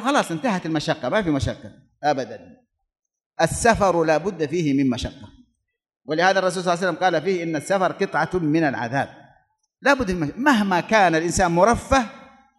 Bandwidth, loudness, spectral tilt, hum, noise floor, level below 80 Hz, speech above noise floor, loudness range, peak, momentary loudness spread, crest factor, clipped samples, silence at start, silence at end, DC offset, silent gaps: 12 kHz; -21 LUFS; -5 dB/octave; none; -74 dBFS; -44 dBFS; 53 dB; 3 LU; -2 dBFS; 10 LU; 20 dB; under 0.1%; 0 s; 0.35 s; under 0.1%; 3.26-3.30 s